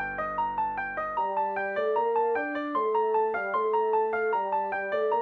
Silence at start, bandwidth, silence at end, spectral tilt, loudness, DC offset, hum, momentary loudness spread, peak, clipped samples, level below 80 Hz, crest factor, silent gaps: 0 s; 4.5 kHz; 0 s; -7 dB/octave; -28 LUFS; under 0.1%; none; 4 LU; -16 dBFS; under 0.1%; -62 dBFS; 12 dB; none